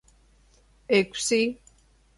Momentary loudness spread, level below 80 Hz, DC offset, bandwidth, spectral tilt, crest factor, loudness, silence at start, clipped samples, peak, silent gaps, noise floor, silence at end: 8 LU; -60 dBFS; under 0.1%; 11.5 kHz; -3 dB/octave; 20 dB; -24 LUFS; 0.9 s; under 0.1%; -8 dBFS; none; -59 dBFS; 0.65 s